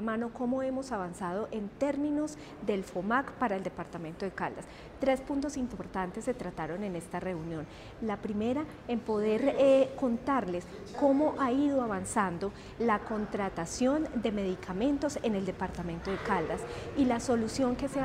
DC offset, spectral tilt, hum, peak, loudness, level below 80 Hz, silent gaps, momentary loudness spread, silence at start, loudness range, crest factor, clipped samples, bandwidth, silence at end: under 0.1%; -6 dB/octave; none; -14 dBFS; -32 LUFS; -54 dBFS; none; 10 LU; 0 s; 6 LU; 16 dB; under 0.1%; 14 kHz; 0 s